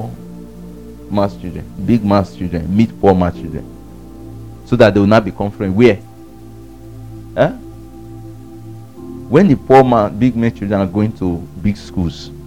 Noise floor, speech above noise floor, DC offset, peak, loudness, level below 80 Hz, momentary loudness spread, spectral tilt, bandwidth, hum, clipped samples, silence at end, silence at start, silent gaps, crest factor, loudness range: -36 dBFS; 23 dB; 0.8%; 0 dBFS; -14 LUFS; -38 dBFS; 24 LU; -8 dB/octave; 15.5 kHz; none; 0.1%; 0 s; 0 s; none; 16 dB; 5 LU